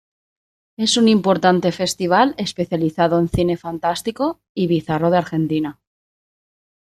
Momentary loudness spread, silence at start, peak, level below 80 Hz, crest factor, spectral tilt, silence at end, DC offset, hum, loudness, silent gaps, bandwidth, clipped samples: 8 LU; 0.8 s; -2 dBFS; -46 dBFS; 18 dB; -5 dB/octave; 1.1 s; under 0.1%; none; -19 LUFS; 4.49-4.55 s; 14 kHz; under 0.1%